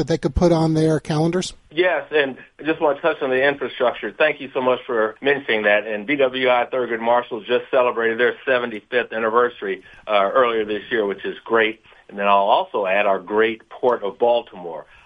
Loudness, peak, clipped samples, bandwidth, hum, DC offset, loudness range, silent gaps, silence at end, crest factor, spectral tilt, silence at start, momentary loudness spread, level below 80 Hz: -20 LUFS; -2 dBFS; under 0.1%; 11.5 kHz; none; under 0.1%; 1 LU; none; 0.25 s; 18 dB; -5.5 dB/octave; 0 s; 7 LU; -42 dBFS